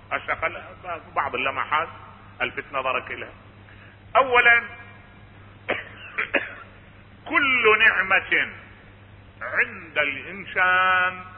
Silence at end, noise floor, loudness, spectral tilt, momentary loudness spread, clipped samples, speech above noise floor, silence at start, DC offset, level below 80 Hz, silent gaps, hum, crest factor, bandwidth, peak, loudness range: 0 s; -48 dBFS; -21 LUFS; -8 dB/octave; 19 LU; under 0.1%; 25 dB; 0.1 s; under 0.1%; -54 dBFS; none; none; 20 dB; 4.7 kHz; -4 dBFS; 6 LU